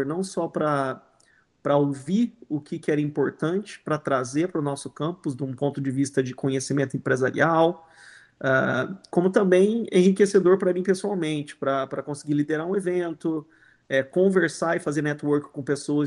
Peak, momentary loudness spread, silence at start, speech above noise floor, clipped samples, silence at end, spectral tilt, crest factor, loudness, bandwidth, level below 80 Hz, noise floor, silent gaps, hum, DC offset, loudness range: -6 dBFS; 10 LU; 0 s; 38 dB; under 0.1%; 0 s; -6 dB/octave; 18 dB; -24 LUFS; 11.5 kHz; -68 dBFS; -62 dBFS; none; none; under 0.1%; 5 LU